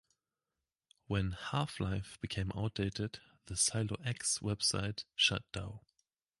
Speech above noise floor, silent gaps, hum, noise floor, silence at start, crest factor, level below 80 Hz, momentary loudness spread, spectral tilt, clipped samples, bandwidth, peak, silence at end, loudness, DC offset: over 53 dB; none; none; under -90 dBFS; 1.1 s; 22 dB; -54 dBFS; 12 LU; -3 dB/octave; under 0.1%; 11.5 kHz; -16 dBFS; 0.6 s; -36 LUFS; under 0.1%